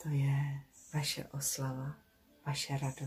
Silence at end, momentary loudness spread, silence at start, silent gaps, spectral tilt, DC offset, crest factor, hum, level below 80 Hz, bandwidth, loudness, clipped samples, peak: 0 s; 13 LU; 0 s; none; -4.5 dB/octave; under 0.1%; 16 dB; none; -66 dBFS; 15.5 kHz; -37 LUFS; under 0.1%; -22 dBFS